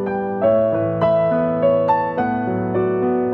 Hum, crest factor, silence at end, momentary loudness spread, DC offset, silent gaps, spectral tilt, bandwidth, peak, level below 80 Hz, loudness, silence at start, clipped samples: none; 14 dB; 0 s; 4 LU; under 0.1%; none; -10.5 dB/octave; 5.4 kHz; -4 dBFS; -52 dBFS; -18 LUFS; 0 s; under 0.1%